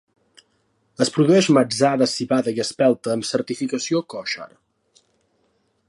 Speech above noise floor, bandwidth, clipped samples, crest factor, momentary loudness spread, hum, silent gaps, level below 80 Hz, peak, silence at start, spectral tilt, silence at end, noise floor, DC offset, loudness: 47 dB; 11.5 kHz; under 0.1%; 18 dB; 12 LU; none; none; -68 dBFS; -4 dBFS; 1 s; -5 dB/octave; 1.45 s; -66 dBFS; under 0.1%; -20 LUFS